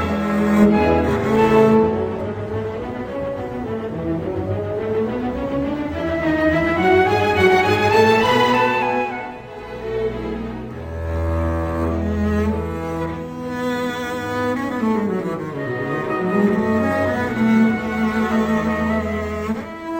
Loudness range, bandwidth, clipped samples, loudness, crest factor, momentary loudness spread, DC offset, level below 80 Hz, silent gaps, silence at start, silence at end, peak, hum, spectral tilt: 8 LU; 17 kHz; under 0.1%; -19 LUFS; 16 dB; 12 LU; under 0.1%; -40 dBFS; none; 0 s; 0 s; -2 dBFS; none; -7 dB/octave